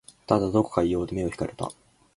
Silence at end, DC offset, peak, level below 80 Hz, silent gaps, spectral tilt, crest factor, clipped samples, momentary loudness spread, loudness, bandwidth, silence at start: 0.45 s; under 0.1%; -4 dBFS; -48 dBFS; none; -7 dB/octave; 22 dB; under 0.1%; 11 LU; -26 LUFS; 11.5 kHz; 0.3 s